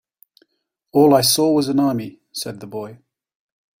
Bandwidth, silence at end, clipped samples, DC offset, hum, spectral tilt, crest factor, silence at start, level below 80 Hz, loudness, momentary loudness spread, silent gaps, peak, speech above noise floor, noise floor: 16 kHz; 0.85 s; under 0.1%; under 0.1%; none; -4.5 dB/octave; 18 dB; 0.95 s; -60 dBFS; -17 LUFS; 18 LU; none; -2 dBFS; 48 dB; -65 dBFS